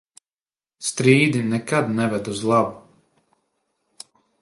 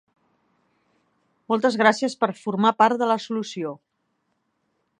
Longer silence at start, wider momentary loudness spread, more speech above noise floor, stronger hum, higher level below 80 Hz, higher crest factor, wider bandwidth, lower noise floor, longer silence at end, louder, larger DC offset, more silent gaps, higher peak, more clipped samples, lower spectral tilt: second, 0.8 s vs 1.5 s; about the same, 11 LU vs 13 LU; first, over 70 dB vs 52 dB; neither; first, -62 dBFS vs -80 dBFS; about the same, 22 dB vs 22 dB; first, 11.5 kHz vs 10 kHz; first, under -90 dBFS vs -73 dBFS; first, 1.6 s vs 1.25 s; about the same, -20 LUFS vs -22 LUFS; neither; neither; about the same, -2 dBFS vs -2 dBFS; neither; about the same, -5.5 dB/octave vs -5 dB/octave